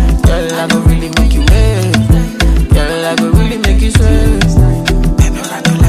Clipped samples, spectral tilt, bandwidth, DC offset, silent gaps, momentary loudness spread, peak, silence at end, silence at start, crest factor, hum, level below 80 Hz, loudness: 0.2%; -5.5 dB/octave; 15 kHz; under 0.1%; none; 3 LU; 0 dBFS; 0 s; 0 s; 8 dB; none; -12 dBFS; -11 LUFS